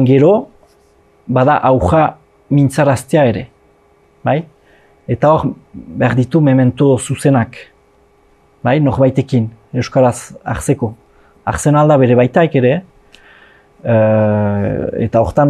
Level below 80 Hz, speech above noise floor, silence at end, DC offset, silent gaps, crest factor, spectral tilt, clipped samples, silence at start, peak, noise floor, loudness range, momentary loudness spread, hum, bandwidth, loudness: -40 dBFS; 39 dB; 0 s; under 0.1%; none; 14 dB; -7.5 dB/octave; under 0.1%; 0 s; 0 dBFS; -51 dBFS; 3 LU; 12 LU; none; 13 kHz; -13 LUFS